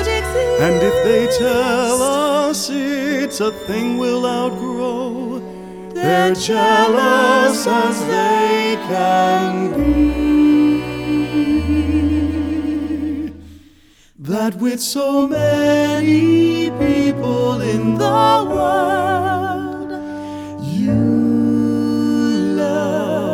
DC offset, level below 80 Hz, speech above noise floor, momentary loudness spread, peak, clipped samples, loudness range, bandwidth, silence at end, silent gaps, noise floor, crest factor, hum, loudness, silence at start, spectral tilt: under 0.1%; -36 dBFS; 34 dB; 10 LU; 0 dBFS; under 0.1%; 5 LU; 17 kHz; 0 s; none; -49 dBFS; 16 dB; none; -16 LUFS; 0 s; -5 dB/octave